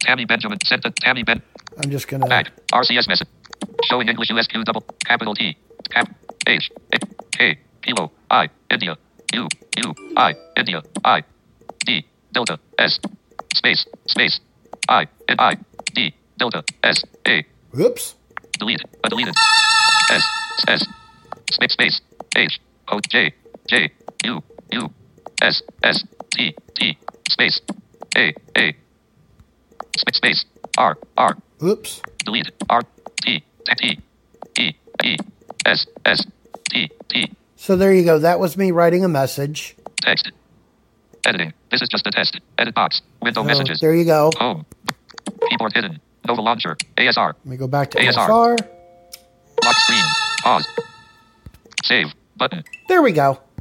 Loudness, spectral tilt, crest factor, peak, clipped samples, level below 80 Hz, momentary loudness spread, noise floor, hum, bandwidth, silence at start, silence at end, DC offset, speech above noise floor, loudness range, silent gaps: -18 LUFS; -3 dB/octave; 18 dB; 0 dBFS; under 0.1%; -58 dBFS; 12 LU; -58 dBFS; none; 16.5 kHz; 0 s; 0.25 s; under 0.1%; 39 dB; 4 LU; none